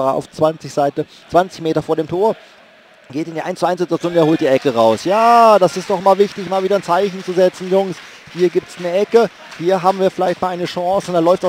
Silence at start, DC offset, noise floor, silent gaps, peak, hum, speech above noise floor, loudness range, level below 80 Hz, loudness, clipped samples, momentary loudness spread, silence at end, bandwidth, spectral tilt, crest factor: 0 s; under 0.1%; -46 dBFS; none; 0 dBFS; none; 30 dB; 6 LU; -58 dBFS; -16 LUFS; under 0.1%; 8 LU; 0 s; 16 kHz; -6 dB/octave; 16 dB